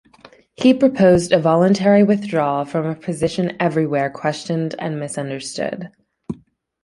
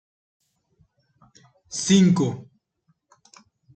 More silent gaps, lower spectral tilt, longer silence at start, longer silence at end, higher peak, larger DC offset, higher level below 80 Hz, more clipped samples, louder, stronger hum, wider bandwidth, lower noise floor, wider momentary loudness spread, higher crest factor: neither; about the same, -6.5 dB/octave vs -5.5 dB/octave; second, 0.6 s vs 1.7 s; second, 0.5 s vs 1.35 s; first, -2 dBFS vs -6 dBFS; neither; first, -52 dBFS vs -62 dBFS; neither; about the same, -18 LUFS vs -20 LUFS; neither; first, 11.5 kHz vs 9 kHz; second, -48 dBFS vs -69 dBFS; second, 13 LU vs 17 LU; about the same, 16 dB vs 20 dB